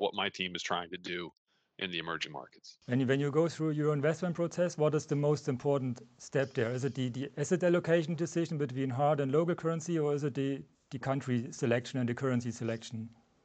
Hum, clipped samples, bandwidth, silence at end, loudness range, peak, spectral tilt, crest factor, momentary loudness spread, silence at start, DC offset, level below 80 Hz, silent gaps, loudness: none; under 0.1%; 9 kHz; 0.35 s; 3 LU; -14 dBFS; -6 dB/octave; 18 dB; 11 LU; 0 s; under 0.1%; -74 dBFS; 1.37-1.45 s; -33 LUFS